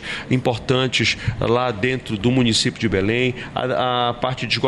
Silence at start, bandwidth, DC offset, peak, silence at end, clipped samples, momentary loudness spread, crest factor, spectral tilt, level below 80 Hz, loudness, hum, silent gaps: 0 s; 11 kHz; under 0.1%; -4 dBFS; 0 s; under 0.1%; 5 LU; 16 dB; -5 dB/octave; -42 dBFS; -20 LUFS; none; none